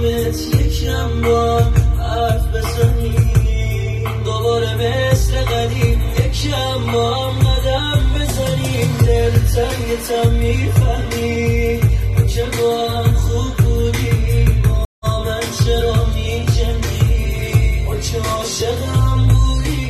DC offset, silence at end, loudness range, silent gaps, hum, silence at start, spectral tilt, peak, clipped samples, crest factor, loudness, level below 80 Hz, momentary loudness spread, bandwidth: under 0.1%; 0 s; 1 LU; 14.85-15.02 s; none; 0 s; -5.5 dB/octave; 0 dBFS; under 0.1%; 14 dB; -17 LUFS; -20 dBFS; 5 LU; 13.5 kHz